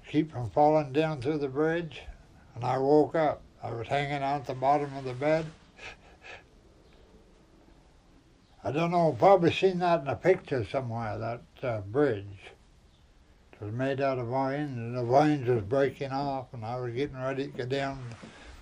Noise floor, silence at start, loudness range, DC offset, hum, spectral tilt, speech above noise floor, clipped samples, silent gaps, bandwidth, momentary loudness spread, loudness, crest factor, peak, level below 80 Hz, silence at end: -59 dBFS; 0.05 s; 7 LU; under 0.1%; none; -7.5 dB/octave; 31 dB; under 0.1%; none; 10.5 kHz; 20 LU; -29 LUFS; 20 dB; -8 dBFS; -58 dBFS; 0 s